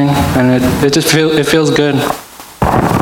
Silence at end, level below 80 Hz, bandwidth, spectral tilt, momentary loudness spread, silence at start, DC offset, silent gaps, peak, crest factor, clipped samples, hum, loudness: 0 s; -32 dBFS; 17 kHz; -5 dB/octave; 8 LU; 0 s; under 0.1%; none; 0 dBFS; 12 dB; under 0.1%; none; -11 LUFS